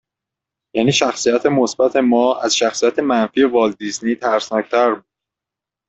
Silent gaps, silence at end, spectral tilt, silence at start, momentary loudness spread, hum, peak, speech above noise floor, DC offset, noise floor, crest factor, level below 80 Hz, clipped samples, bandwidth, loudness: none; 0.9 s; -4 dB/octave; 0.75 s; 5 LU; none; -2 dBFS; 70 dB; under 0.1%; -86 dBFS; 16 dB; -60 dBFS; under 0.1%; 8.2 kHz; -16 LUFS